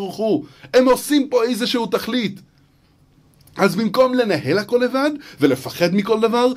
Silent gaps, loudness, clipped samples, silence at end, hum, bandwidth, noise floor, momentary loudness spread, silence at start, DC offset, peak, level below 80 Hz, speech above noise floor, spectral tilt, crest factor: none; -18 LUFS; under 0.1%; 0 s; none; 16 kHz; -55 dBFS; 6 LU; 0 s; under 0.1%; -2 dBFS; -56 dBFS; 37 dB; -5 dB/octave; 16 dB